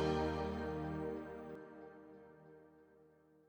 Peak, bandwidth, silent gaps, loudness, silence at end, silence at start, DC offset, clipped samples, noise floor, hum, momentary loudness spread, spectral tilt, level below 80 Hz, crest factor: -24 dBFS; over 20 kHz; none; -42 LUFS; 0.4 s; 0 s; under 0.1%; under 0.1%; -68 dBFS; none; 23 LU; -7 dB/octave; -56 dBFS; 18 dB